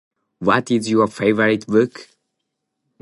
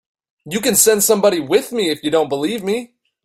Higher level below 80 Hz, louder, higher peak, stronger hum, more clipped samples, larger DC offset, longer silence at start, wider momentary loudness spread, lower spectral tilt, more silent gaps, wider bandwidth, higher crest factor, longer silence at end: about the same, -58 dBFS vs -58 dBFS; about the same, -18 LUFS vs -16 LUFS; about the same, -2 dBFS vs 0 dBFS; neither; neither; neither; about the same, 0.4 s vs 0.45 s; second, 4 LU vs 10 LU; first, -6 dB/octave vs -2.5 dB/octave; neither; second, 11.5 kHz vs 16 kHz; about the same, 18 dB vs 18 dB; first, 1 s vs 0.4 s